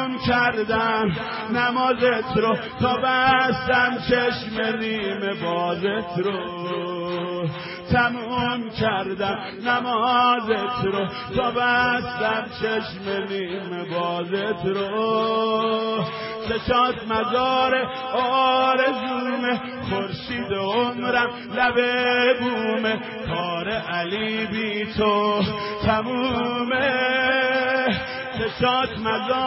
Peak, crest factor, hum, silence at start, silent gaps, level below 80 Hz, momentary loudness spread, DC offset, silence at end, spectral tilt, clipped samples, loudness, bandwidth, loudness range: -6 dBFS; 16 dB; none; 0 s; none; -48 dBFS; 8 LU; under 0.1%; 0 s; -9.5 dB/octave; under 0.1%; -22 LUFS; 5.8 kHz; 4 LU